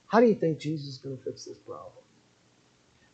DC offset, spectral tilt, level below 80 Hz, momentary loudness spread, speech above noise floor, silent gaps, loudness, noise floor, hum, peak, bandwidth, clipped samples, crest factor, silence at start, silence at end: under 0.1%; -7 dB/octave; -76 dBFS; 22 LU; 36 dB; none; -28 LUFS; -64 dBFS; none; -8 dBFS; 8.2 kHz; under 0.1%; 22 dB; 0.1 s; 1.25 s